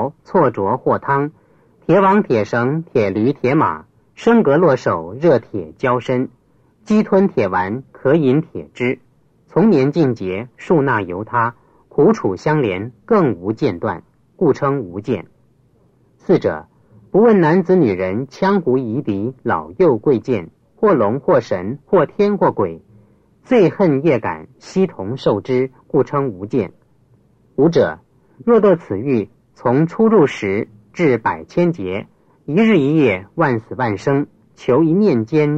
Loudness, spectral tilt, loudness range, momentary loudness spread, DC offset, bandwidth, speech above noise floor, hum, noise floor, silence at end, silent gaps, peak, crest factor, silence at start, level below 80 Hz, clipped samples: -17 LUFS; -8.5 dB/octave; 3 LU; 11 LU; under 0.1%; 7.8 kHz; 39 dB; none; -55 dBFS; 0 s; none; -2 dBFS; 16 dB; 0 s; -56 dBFS; under 0.1%